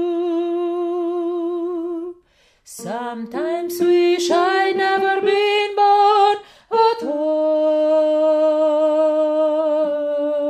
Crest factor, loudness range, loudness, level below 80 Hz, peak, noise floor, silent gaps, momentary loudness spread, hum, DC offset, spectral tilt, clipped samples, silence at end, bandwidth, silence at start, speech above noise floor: 14 dB; 8 LU; -18 LUFS; -68 dBFS; -4 dBFS; -56 dBFS; none; 11 LU; none; under 0.1%; -3.5 dB/octave; under 0.1%; 0 s; 14.5 kHz; 0 s; 38 dB